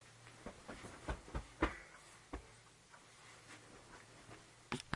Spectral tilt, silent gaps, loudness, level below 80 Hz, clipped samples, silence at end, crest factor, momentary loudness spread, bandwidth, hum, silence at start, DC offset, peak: -4.5 dB/octave; none; -50 LUFS; -56 dBFS; under 0.1%; 0 s; 30 dB; 18 LU; 11.5 kHz; none; 0 s; under 0.1%; -18 dBFS